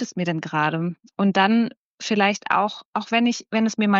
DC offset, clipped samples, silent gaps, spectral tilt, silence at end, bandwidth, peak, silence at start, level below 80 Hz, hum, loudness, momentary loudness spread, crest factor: under 0.1%; under 0.1%; 1.77-1.98 s, 2.85-2.93 s; -4 dB/octave; 0 s; 7.8 kHz; -4 dBFS; 0 s; -74 dBFS; none; -22 LUFS; 9 LU; 18 dB